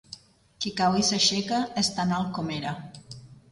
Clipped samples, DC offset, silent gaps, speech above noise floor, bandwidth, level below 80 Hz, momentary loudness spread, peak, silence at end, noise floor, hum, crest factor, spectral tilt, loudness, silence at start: under 0.1%; under 0.1%; none; 23 dB; 11.5 kHz; -58 dBFS; 23 LU; -10 dBFS; 0.1 s; -49 dBFS; none; 18 dB; -3.5 dB/octave; -25 LUFS; 0.1 s